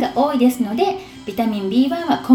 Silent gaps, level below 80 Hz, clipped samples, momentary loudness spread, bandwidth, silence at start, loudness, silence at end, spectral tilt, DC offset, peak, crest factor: none; -54 dBFS; under 0.1%; 7 LU; 17 kHz; 0 s; -19 LUFS; 0 s; -5.5 dB/octave; under 0.1%; 0 dBFS; 16 dB